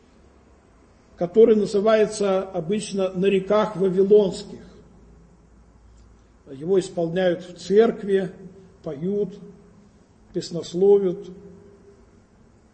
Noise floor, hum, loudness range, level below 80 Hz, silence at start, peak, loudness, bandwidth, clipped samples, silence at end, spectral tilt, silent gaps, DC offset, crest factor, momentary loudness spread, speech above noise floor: -54 dBFS; none; 5 LU; -56 dBFS; 1.2 s; -4 dBFS; -21 LUFS; 8.8 kHz; under 0.1%; 1.25 s; -6 dB/octave; none; under 0.1%; 18 dB; 18 LU; 34 dB